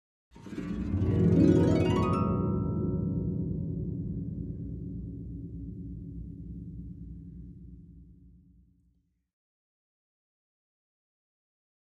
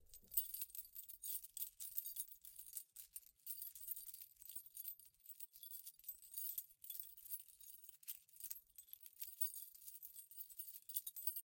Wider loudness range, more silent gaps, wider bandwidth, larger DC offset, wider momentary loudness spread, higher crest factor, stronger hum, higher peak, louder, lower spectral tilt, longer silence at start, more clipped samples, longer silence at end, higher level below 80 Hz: first, 21 LU vs 4 LU; neither; second, 10 kHz vs 17 kHz; neither; first, 21 LU vs 12 LU; second, 22 dB vs 30 dB; neither; first, -10 dBFS vs -22 dBFS; first, -30 LUFS vs -49 LUFS; first, -9 dB/octave vs 2.5 dB/octave; first, 0.35 s vs 0 s; neither; first, 3.55 s vs 0.15 s; first, -46 dBFS vs -84 dBFS